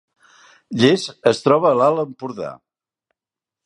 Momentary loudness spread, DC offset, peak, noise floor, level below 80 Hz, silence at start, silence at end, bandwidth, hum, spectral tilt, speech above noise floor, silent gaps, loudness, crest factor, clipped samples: 15 LU; under 0.1%; 0 dBFS; -89 dBFS; -66 dBFS; 0.7 s; 1.1 s; 11 kHz; none; -5.5 dB/octave; 71 dB; none; -17 LUFS; 20 dB; under 0.1%